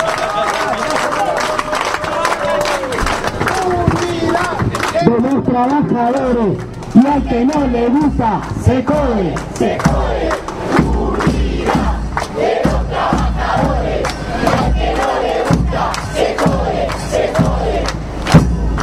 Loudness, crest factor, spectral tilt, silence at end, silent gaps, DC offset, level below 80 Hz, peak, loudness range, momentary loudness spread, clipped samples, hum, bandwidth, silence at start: -15 LUFS; 14 dB; -6 dB/octave; 0 s; none; under 0.1%; -24 dBFS; 0 dBFS; 2 LU; 5 LU; under 0.1%; none; 15 kHz; 0 s